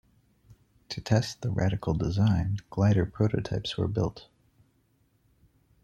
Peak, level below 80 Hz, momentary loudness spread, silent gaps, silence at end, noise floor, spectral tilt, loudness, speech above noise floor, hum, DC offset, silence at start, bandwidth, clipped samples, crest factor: -10 dBFS; -50 dBFS; 7 LU; none; 1.6 s; -68 dBFS; -7 dB/octave; -28 LUFS; 42 dB; none; under 0.1%; 0.9 s; 8.4 kHz; under 0.1%; 20 dB